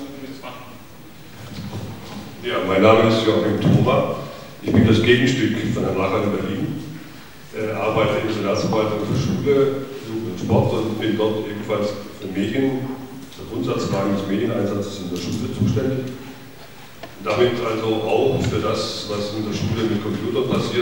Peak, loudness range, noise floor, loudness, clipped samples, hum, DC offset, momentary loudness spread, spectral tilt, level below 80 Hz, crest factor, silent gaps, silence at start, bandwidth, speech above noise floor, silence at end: 0 dBFS; 6 LU; -42 dBFS; -21 LUFS; under 0.1%; none; 0.7%; 19 LU; -6.5 dB/octave; -48 dBFS; 20 dB; none; 0 s; 18 kHz; 22 dB; 0 s